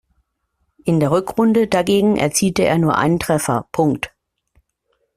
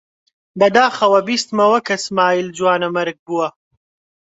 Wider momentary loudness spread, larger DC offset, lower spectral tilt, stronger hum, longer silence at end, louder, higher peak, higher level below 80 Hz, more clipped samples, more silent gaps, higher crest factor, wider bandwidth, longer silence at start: second, 5 LU vs 9 LU; neither; first, -5.5 dB/octave vs -4 dB/octave; neither; first, 1.1 s vs 0.85 s; about the same, -17 LUFS vs -16 LUFS; about the same, -2 dBFS vs 0 dBFS; first, -48 dBFS vs -64 dBFS; neither; second, none vs 3.19-3.26 s; about the same, 16 dB vs 18 dB; first, 15 kHz vs 8.2 kHz; first, 0.85 s vs 0.55 s